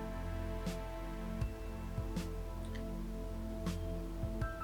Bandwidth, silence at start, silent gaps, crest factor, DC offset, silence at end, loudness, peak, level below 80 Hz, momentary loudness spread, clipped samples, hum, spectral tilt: 19 kHz; 0 s; none; 14 dB; under 0.1%; 0 s; -43 LUFS; -26 dBFS; -44 dBFS; 4 LU; under 0.1%; none; -6.5 dB/octave